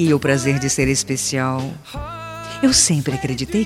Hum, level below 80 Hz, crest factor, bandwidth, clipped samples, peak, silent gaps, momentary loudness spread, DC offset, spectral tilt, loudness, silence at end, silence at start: none; -40 dBFS; 18 dB; 15.5 kHz; under 0.1%; -2 dBFS; none; 17 LU; under 0.1%; -4 dB/octave; -18 LUFS; 0 s; 0 s